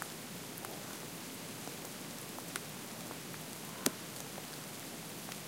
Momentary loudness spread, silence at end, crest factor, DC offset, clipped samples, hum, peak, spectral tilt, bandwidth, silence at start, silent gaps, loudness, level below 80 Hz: 8 LU; 0 s; 40 dB; under 0.1%; under 0.1%; none; -4 dBFS; -2.5 dB/octave; 17 kHz; 0 s; none; -43 LUFS; -76 dBFS